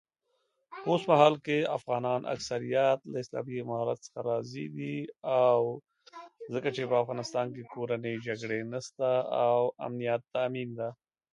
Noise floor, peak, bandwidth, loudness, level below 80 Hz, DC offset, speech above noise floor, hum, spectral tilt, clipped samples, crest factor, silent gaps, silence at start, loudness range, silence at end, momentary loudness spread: -78 dBFS; -6 dBFS; 10.5 kHz; -31 LUFS; -76 dBFS; under 0.1%; 48 dB; none; -6 dB/octave; under 0.1%; 24 dB; none; 0.7 s; 4 LU; 0.4 s; 13 LU